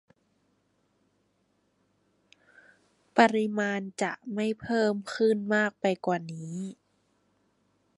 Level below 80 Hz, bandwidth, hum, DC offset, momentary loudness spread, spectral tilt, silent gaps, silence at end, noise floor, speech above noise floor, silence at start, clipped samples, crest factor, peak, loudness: -74 dBFS; 11.5 kHz; none; under 0.1%; 14 LU; -5.5 dB/octave; none; 1.25 s; -72 dBFS; 45 dB; 3.15 s; under 0.1%; 26 dB; -6 dBFS; -28 LUFS